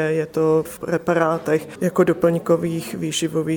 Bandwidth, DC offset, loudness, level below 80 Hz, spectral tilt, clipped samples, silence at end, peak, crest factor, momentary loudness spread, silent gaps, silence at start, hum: 20 kHz; under 0.1%; -20 LUFS; -56 dBFS; -5.5 dB/octave; under 0.1%; 0 s; -4 dBFS; 16 dB; 6 LU; none; 0 s; none